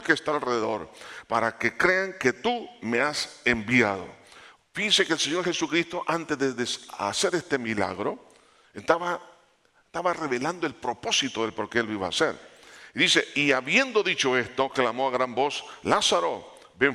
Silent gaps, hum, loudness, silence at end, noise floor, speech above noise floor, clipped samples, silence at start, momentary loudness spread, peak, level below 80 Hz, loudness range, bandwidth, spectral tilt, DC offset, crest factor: none; none; -25 LUFS; 0 s; -64 dBFS; 38 dB; under 0.1%; 0 s; 11 LU; -4 dBFS; -62 dBFS; 5 LU; 14.5 kHz; -3 dB/octave; under 0.1%; 22 dB